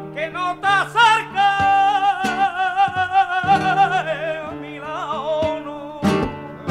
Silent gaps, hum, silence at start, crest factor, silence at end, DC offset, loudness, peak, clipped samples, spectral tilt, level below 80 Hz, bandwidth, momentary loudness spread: none; none; 0 s; 16 dB; 0 s; under 0.1%; -19 LUFS; -4 dBFS; under 0.1%; -4.5 dB/octave; -48 dBFS; 12.5 kHz; 13 LU